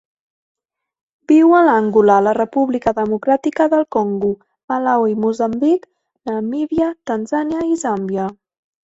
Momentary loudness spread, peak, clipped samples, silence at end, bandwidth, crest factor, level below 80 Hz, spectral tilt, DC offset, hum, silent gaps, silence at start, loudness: 11 LU; 0 dBFS; under 0.1%; 0.6 s; 8 kHz; 16 dB; -54 dBFS; -7 dB/octave; under 0.1%; none; 4.64-4.68 s; 1.3 s; -16 LUFS